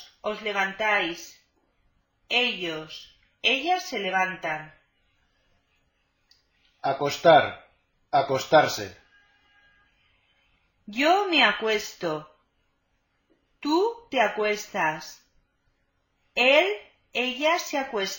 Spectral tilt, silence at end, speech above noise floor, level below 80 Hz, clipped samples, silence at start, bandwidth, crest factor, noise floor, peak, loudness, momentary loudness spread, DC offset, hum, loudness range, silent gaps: -3 dB/octave; 0 s; 48 dB; -66 dBFS; under 0.1%; 0 s; 17 kHz; 22 dB; -72 dBFS; -6 dBFS; -24 LUFS; 16 LU; under 0.1%; none; 5 LU; none